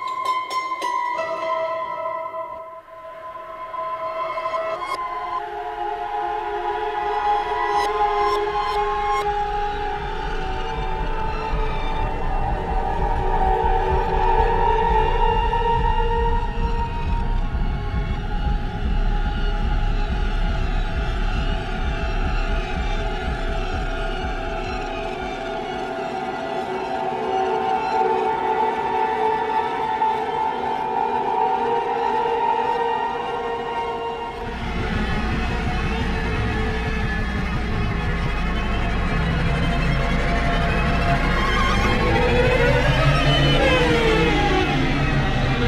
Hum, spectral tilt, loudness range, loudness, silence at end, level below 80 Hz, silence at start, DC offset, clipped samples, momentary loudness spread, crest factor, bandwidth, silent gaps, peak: none; -6 dB/octave; 8 LU; -23 LUFS; 0 s; -26 dBFS; 0 s; under 0.1%; under 0.1%; 9 LU; 16 dB; 11 kHz; none; -6 dBFS